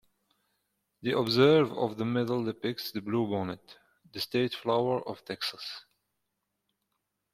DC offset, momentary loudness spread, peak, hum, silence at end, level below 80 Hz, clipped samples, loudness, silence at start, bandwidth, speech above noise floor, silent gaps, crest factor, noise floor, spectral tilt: under 0.1%; 16 LU; -10 dBFS; 50 Hz at -60 dBFS; 1.55 s; -70 dBFS; under 0.1%; -29 LUFS; 1.05 s; 16 kHz; 53 dB; none; 22 dB; -82 dBFS; -6 dB/octave